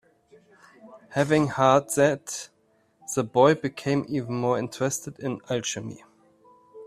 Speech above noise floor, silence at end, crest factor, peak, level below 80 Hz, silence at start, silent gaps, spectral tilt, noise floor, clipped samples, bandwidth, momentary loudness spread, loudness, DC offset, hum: 39 dB; 0 s; 22 dB; -4 dBFS; -64 dBFS; 0.85 s; none; -5 dB/octave; -64 dBFS; under 0.1%; 15.5 kHz; 15 LU; -25 LUFS; under 0.1%; none